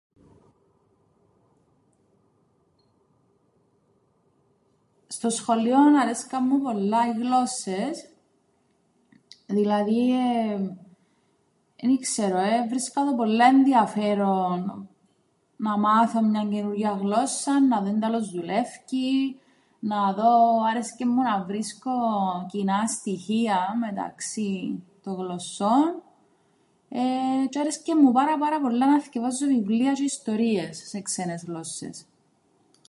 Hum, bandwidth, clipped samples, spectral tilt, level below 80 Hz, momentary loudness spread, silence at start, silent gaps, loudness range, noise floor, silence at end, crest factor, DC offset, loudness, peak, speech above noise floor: none; 11.5 kHz; under 0.1%; -5 dB/octave; -76 dBFS; 13 LU; 5.1 s; none; 5 LU; -68 dBFS; 0.9 s; 18 dB; under 0.1%; -24 LUFS; -6 dBFS; 44 dB